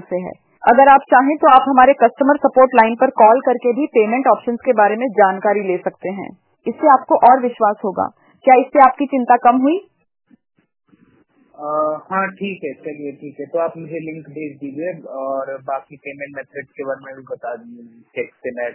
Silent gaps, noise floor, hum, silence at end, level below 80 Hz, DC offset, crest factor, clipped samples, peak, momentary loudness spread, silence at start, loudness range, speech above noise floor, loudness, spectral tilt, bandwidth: none; -56 dBFS; none; 0 s; -60 dBFS; under 0.1%; 16 dB; under 0.1%; 0 dBFS; 19 LU; 0.1 s; 15 LU; 40 dB; -14 LUFS; -9.5 dB/octave; 4 kHz